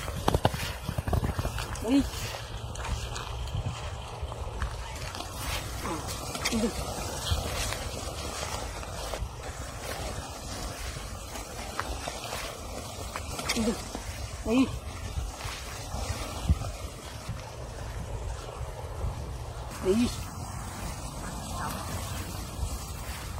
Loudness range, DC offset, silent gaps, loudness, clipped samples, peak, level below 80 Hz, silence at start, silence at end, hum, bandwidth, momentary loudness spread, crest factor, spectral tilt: 4 LU; under 0.1%; none; -34 LUFS; under 0.1%; -4 dBFS; -40 dBFS; 0 s; 0 s; none; 16 kHz; 10 LU; 30 dB; -4.5 dB/octave